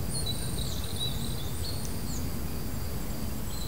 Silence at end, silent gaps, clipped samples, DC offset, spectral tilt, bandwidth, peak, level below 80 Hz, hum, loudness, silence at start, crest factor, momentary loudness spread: 0 s; none; under 0.1%; 2%; -4 dB/octave; 16 kHz; -20 dBFS; -40 dBFS; none; -34 LUFS; 0 s; 12 dB; 4 LU